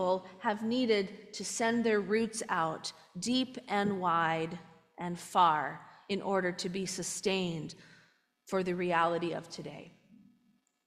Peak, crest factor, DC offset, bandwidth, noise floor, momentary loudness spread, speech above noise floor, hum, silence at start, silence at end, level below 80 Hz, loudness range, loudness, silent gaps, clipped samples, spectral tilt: -14 dBFS; 20 dB; under 0.1%; 15.5 kHz; -72 dBFS; 13 LU; 39 dB; none; 0 s; 0.95 s; -74 dBFS; 3 LU; -32 LUFS; none; under 0.1%; -4 dB/octave